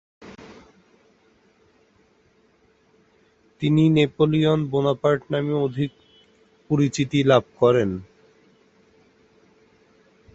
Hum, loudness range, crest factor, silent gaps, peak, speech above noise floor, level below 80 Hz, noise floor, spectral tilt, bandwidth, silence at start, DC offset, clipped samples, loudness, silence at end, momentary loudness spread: none; 3 LU; 22 dB; none; -2 dBFS; 41 dB; -56 dBFS; -61 dBFS; -7 dB/octave; 8 kHz; 0.2 s; under 0.1%; under 0.1%; -21 LUFS; 2.3 s; 10 LU